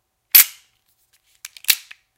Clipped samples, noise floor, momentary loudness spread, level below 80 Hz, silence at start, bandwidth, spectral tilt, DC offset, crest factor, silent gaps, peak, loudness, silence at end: 0.1%; -64 dBFS; 9 LU; -70 dBFS; 0.35 s; 17.5 kHz; 4 dB/octave; under 0.1%; 20 dB; none; 0 dBFS; -14 LUFS; 0.4 s